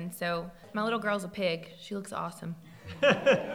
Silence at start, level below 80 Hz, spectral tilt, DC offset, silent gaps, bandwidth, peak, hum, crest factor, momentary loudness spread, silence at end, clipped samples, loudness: 0 s; -64 dBFS; -5 dB/octave; under 0.1%; none; 16.5 kHz; -12 dBFS; none; 20 dB; 17 LU; 0 s; under 0.1%; -31 LUFS